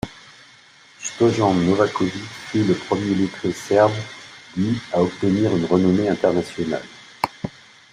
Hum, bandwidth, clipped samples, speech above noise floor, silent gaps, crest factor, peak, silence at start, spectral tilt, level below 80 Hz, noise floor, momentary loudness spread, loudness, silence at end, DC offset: none; 13 kHz; under 0.1%; 30 dB; none; 18 dB; -2 dBFS; 0.05 s; -6 dB/octave; -54 dBFS; -49 dBFS; 15 LU; -21 LUFS; 0.45 s; under 0.1%